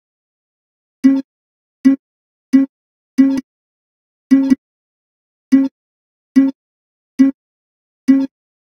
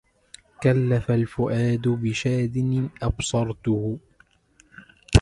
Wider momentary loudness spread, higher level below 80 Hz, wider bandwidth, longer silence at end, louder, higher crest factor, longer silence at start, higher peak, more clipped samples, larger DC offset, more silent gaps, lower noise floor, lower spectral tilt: first, 8 LU vs 5 LU; second, -64 dBFS vs -36 dBFS; second, 10 kHz vs 11.5 kHz; first, 0.45 s vs 0 s; first, -16 LUFS vs -24 LUFS; second, 18 dB vs 24 dB; first, 1.05 s vs 0.6 s; about the same, 0 dBFS vs 0 dBFS; neither; neither; first, 1.24-1.84 s, 1.99-2.52 s, 2.69-3.18 s, 3.43-4.30 s, 4.58-5.51 s, 5.71-6.35 s, 6.55-7.18 s, 7.34-8.07 s vs none; first, under -90 dBFS vs -60 dBFS; about the same, -6 dB/octave vs -6.5 dB/octave